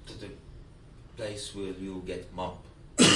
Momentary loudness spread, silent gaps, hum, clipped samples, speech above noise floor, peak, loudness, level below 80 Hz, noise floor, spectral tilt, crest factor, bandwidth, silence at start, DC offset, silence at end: 15 LU; none; none; under 0.1%; 14 dB; -8 dBFS; -34 LUFS; -52 dBFS; -51 dBFS; -3 dB/octave; 24 dB; 11.5 kHz; 0 s; under 0.1%; 0 s